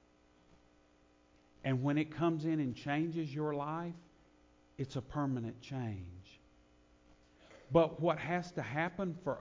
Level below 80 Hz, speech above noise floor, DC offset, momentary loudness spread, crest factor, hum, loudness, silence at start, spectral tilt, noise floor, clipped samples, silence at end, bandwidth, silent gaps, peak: -64 dBFS; 32 dB; under 0.1%; 12 LU; 24 dB; 60 Hz at -70 dBFS; -37 LUFS; 1.65 s; -7.5 dB/octave; -68 dBFS; under 0.1%; 0 s; 7.6 kHz; none; -14 dBFS